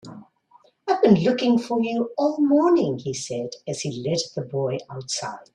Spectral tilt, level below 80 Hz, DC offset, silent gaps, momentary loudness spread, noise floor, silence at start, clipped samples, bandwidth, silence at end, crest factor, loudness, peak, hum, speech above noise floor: -5.5 dB/octave; -62 dBFS; under 0.1%; none; 12 LU; -58 dBFS; 0.05 s; under 0.1%; 11 kHz; 0.15 s; 20 dB; -23 LUFS; -2 dBFS; none; 35 dB